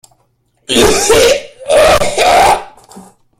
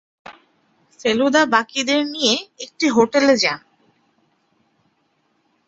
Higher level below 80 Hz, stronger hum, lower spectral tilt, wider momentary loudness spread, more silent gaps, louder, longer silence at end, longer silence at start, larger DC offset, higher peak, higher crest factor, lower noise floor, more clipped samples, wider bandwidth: first, -30 dBFS vs -62 dBFS; neither; about the same, -2.5 dB/octave vs -2.5 dB/octave; about the same, 6 LU vs 8 LU; neither; first, -9 LUFS vs -17 LUFS; second, 0.4 s vs 2.1 s; first, 0.7 s vs 0.3 s; neither; about the same, 0 dBFS vs -2 dBFS; second, 12 dB vs 20 dB; second, -58 dBFS vs -66 dBFS; neither; first, 17 kHz vs 8.2 kHz